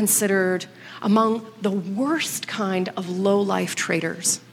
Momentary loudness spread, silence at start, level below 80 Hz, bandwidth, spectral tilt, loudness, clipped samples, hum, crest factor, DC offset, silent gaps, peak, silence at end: 7 LU; 0 s; -72 dBFS; 17 kHz; -4 dB/octave; -23 LUFS; under 0.1%; none; 18 dB; under 0.1%; none; -6 dBFS; 0.1 s